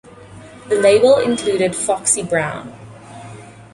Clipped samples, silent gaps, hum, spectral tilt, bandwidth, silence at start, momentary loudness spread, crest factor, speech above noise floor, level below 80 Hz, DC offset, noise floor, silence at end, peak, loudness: under 0.1%; none; none; -3.5 dB/octave; 11.5 kHz; 0.2 s; 24 LU; 16 dB; 24 dB; -52 dBFS; under 0.1%; -39 dBFS; 0.1 s; -2 dBFS; -16 LUFS